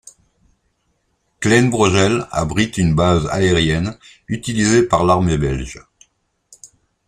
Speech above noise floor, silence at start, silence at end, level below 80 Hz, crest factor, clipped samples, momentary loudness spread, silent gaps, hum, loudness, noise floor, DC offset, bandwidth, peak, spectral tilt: 50 dB; 1.4 s; 0.4 s; -36 dBFS; 18 dB; under 0.1%; 12 LU; none; none; -16 LUFS; -66 dBFS; under 0.1%; 14 kHz; 0 dBFS; -5 dB/octave